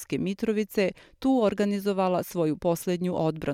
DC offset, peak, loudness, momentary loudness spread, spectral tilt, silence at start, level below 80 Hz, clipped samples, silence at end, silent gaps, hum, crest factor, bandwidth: under 0.1%; -12 dBFS; -27 LUFS; 4 LU; -6.5 dB/octave; 0 s; -58 dBFS; under 0.1%; 0 s; none; none; 14 dB; 16.5 kHz